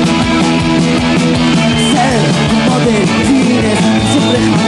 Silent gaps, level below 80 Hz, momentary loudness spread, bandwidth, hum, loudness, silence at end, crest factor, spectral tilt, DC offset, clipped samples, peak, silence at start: none; -32 dBFS; 1 LU; 12 kHz; none; -10 LUFS; 0 s; 10 dB; -5 dB/octave; under 0.1%; under 0.1%; 0 dBFS; 0 s